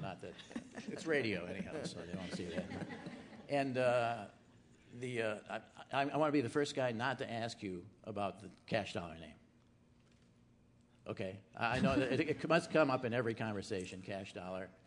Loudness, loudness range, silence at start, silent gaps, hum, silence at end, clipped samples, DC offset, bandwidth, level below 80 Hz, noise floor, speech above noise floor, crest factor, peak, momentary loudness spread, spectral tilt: -39 LUFS; 9 LU; 0 s; none; none; 0.15 s; under 0.1%; under 0.1%; 11 kHz; -70 dBFS; -68 dBFS; 29 dB; 22 dB; -18 dBFS; 15 LU; -5.5 dB/octave